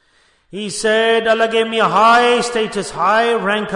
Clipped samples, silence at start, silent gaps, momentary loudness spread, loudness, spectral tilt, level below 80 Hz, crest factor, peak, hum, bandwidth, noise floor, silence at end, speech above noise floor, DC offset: under 0.1%; 0.55 s; none; 11 LU; -14 LUFS; -3 dB/octave; -54 dBFS; 14 dB; -2 dBFS; none; 11 kHz; -56 dBFS; 0 s; 41 dB; under 0.1%